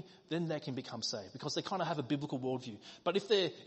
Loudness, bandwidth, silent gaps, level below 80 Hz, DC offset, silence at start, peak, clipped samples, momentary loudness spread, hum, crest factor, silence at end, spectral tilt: -37 LUFS; 8.2 kHz; none; -78 dBFS; under 0.1%; 0 s; -18 dBFS; under 0.1%; 10 LU; none; 20 dB; 0 s; -5 dB/octave